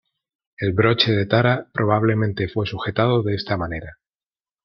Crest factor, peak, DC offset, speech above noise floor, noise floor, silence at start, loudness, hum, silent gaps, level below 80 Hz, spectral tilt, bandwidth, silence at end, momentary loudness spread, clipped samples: 20 dB; -2 dBFS; under 0.1%; over 70 dB; under -90 dBFS; 0.6 s; -20 LUFS; none; none; -50 dBFS; -8 dB/octave; 6 kHz; 0.7 s; 8 LU; under 0.1%